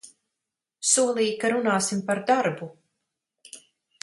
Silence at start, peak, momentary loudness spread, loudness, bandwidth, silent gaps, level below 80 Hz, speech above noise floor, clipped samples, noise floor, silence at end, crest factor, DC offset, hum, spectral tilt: 0.05 s; -4 dBFS; 23 LU; -23 LUFS; 11.5 kHz; none; -74 dBFS; 62 dB; under 0.1%; -86 dBFS; 0.45 s; 22 dB; under 0.1%; none; -3 dB/octave